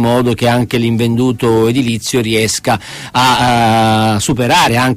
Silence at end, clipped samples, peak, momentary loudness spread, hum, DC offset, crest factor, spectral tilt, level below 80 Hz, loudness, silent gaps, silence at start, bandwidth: 0 s; under 0.1%; 0 dBFS; 5 LU; none; under 0.1%; 12 dB; -4.5 dB/octave; -40 dBFS; -12 LUFS; none; 0 s; 15.5 kHz